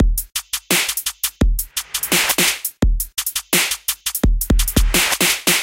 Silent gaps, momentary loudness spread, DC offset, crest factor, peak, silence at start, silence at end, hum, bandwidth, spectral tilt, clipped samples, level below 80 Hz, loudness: none; 7 LU; under 0.1%; 18 dB; 0 dBFS; 0 s; 0 s; none; 17 kHz; -2.5 dB/octave; under 0.1%; -22 dBFS; -18 LUFS